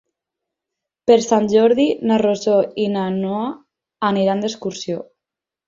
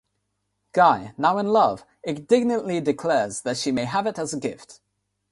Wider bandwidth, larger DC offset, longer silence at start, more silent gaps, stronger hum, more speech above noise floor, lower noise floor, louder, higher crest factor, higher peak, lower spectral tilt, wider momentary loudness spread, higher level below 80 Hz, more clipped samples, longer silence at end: second, 7.6 kHz vs 11.5 kHz; neither; first, 1.05 s vs 0.75 s; neither; second, none vs 50 Hz at -55 dBFS; first, 69 dB vs 53 dB; first, -86 dBFS vs -76 dBFS; first, -18 LUFS vs -23 LUFS; about the same, 18 dB vs 20 dB; about the same, -2 dBFS vs -4 dBFS; about the same, -5.5 dB/octave vs -5 dB/octave; about the same, 12 LU vs 13 LU; about the same, -62 dBFS vs -64 dBFS; neither; about the same, 0.65 s vs 0.6 s